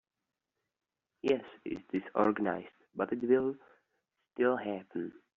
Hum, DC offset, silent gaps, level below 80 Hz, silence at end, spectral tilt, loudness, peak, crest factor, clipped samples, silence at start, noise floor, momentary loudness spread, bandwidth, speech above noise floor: none; under 0.1%; none; -74 dBFS; 0.25 s; -5 dB/octave; -34 LUFS; -14 dBFS; 22 dB; under 0.1%; 1.25 s; -89 dBFS; 13 LU; 7 kHz; 56 dB